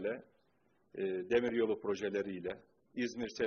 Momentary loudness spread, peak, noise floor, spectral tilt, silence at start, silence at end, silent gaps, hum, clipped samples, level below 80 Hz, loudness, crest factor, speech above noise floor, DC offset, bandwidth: 14 LU; -18 dBFS; -75 dBFS; -4 dB/octave; 0 s; 0 s; none; none; under 0.1%; -72 dBFS; -37 LUFS; 20 dB; 39 dB; under 0.1%; 6.8 kHz